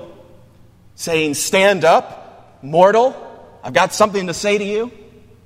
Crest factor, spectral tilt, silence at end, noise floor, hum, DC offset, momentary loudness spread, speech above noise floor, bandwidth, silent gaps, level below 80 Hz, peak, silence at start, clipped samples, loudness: 18 dB; -3.5 dB/octave; 0.55 s; -47 dBFS; none; under 0.1%; 18 LU; 31 dB; 16 kHz; none; -54 dBFS; 0 dBFS; 0 s; under 0.1%; -16 LUFS